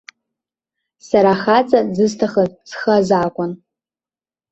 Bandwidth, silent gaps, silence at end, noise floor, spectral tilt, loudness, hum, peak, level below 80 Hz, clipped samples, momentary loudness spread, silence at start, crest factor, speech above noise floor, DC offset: 8.2 kHz; none; 0.95 s; under -90 dBFS; -6 dB/octave; -16 LUFS; none; -2 dBFS; -56 dBFS; under 0.1%; 10 LU; 1.05 s; 16 dB; over 75 dB; under 0.1%